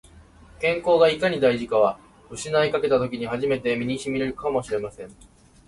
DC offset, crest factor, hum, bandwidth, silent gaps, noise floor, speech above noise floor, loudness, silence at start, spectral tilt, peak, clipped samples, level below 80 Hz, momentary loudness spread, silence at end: under 0.1%; 18 dB; none; 11.5 kHz; none; -49 dBFS; 27 dB; -23 LUFS; 0.15 s; -5 dB/octave; -6 dBFS; under 0.1%; -52 dBFS; 16 LU; 0.55 s